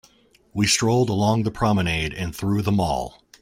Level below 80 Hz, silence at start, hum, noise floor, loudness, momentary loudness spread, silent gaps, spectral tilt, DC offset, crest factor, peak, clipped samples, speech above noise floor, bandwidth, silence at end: -44 dBFS; 0.55 s; none; -56 dBFS; -22 LUFS; 9 LU; none; -5 dB/octave; under 0.1%; 16 dB; -6 dBFS; under 0.1%; 35 dB; 16 kHz; 0.35 s